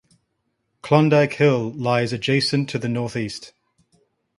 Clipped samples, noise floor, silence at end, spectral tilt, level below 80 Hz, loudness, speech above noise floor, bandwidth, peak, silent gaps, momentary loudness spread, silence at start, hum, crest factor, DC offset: under 0.1%; -73 dBFS; 0.9 s; -6 dB/octave; -60 dBFS; -20 LUFS; 53 dB; 11.5 kHz; -2 dBFS; none; 12 LU; 0.85 s; none; 20 dB; under 0.1%